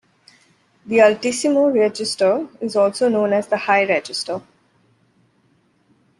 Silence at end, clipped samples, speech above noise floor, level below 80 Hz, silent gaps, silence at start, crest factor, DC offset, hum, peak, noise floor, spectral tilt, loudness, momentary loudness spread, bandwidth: 1.8 s; under 0.1%; 43 dB; -68 dBFS; none; 0.85 s; 18 dB; under 0.1%; none; -2 dBFS; -60 dBFS; -4 dB/octave; -18 LUFS; 9 LU; 12 kHz